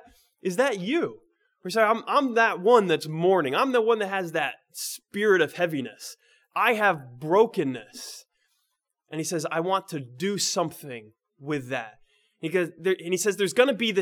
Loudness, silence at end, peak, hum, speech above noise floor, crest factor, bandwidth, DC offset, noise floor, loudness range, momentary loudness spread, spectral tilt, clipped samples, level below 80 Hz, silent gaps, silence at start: -25 LUFS; 0 s; -4 dBFS; none; 53 dB; 20 dB; 19 kHz; under 0.1%; -78 dBFS; 7 LU; 16 LU; -4 dB/octave; under 0.1%; -76 dBFS; none; 0.45 s